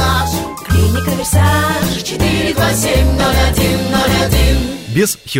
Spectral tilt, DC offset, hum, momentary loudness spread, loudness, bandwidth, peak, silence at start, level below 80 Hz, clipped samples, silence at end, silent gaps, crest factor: -4.5 dB/octave; under 0.1%; none; 4 LU; -14 LUFS; 16.5 kHz; 0 dBFS; 0 s; -20 dBFS; under 0.1%; 0 s; none; 12 dB